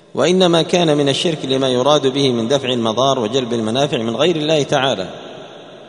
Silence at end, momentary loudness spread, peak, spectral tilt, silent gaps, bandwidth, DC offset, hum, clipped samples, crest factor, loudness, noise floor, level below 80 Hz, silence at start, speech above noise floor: 0 s; 8 LU; 0 dBFS; -5 dB/octave; none; 11 kHz; under 0.1%; none; under 0.1%; 16 dB; -16 LUFS; -36 dBFS; -56 dBFS; 0.15 s; 20 dB